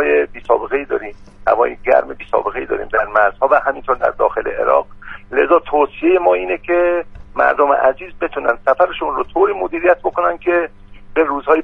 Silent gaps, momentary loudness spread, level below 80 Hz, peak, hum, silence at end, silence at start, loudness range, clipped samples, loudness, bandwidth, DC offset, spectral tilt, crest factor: none; 9 LU; -42 dBFS; 0 dBFS; none; 0 s; 0 s; 2 LU; under 0.1%; -16 LUFS; 5 kHz; under 0.1%; -7 dB/octave; 16 dB